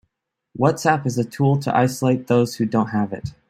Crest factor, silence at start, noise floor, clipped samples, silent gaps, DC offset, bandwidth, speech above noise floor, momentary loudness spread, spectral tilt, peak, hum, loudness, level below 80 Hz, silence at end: 18 dB; 0.55 s; -76 dBFS; under 0.1%; none; under 0.1%; 15.5 kHz; 56 dB; 6 LU; -6.5 dB/octave; -2 dBFS; none; -20 LUFS; -54 dBFS; 0.2 s